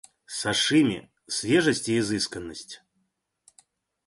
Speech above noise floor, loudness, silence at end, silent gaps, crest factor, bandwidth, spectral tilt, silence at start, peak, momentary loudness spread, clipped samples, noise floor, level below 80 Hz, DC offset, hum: 51 dB; -24 LUFS; 1.3 s; none; 18 dB; 11.5 kHz; -3.5 dB/octave; 0.3 s; -8 dBFS; 17 LU; under 0.1%; -75 dBFS; -60 dBFS; under 0.1%; none